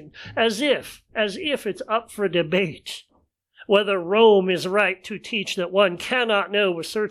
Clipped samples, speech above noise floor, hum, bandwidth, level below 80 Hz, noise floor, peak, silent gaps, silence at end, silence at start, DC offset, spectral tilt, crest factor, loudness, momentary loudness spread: under 0.1%; 42 dB; none; 14.5 kHz; -62 dBFS; -64 dBFS; -4 dBFS; none; 0 s; 0 s; under 0.1%; -4.5 dB/octave; 18 dB; -22 LUFS; 11 LU